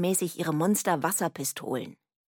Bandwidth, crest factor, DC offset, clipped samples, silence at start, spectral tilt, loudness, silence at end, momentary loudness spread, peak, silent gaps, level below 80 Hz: 17.5 kHz; 18 dB; under 0.1%; under 0.1%; 0 s; -4.5 dB/octave; -28 LUFS; 0.35 s; 9 LU; -12 dBFS; none; -78 dBFS